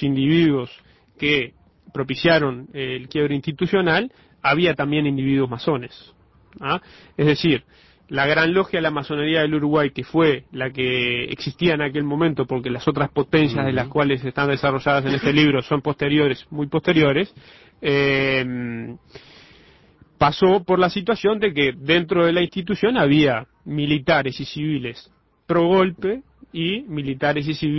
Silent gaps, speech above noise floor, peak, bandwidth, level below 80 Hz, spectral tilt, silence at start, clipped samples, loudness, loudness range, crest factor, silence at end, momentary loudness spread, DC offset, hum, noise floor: none; 33 dB; -4 dBFS; 6 kHz; -50 dBFS; -7.5 dB/octave; 0 s; under 0.1%; -20 LUFS; 3 LU; 16 dB; 0 s; 10 LU; under 0.1%; none; -53 dBFS